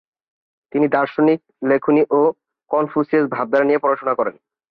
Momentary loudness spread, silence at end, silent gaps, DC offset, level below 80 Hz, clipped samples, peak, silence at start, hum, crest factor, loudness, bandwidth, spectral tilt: 6 LU; 0.4 s; none; under 0.1%; -66 dBFS; under 0.1%; -4 dBFS; 0.75 s; none; 14 dB; -18 LUFS; 5.2 kHz; -9.5 dB/octave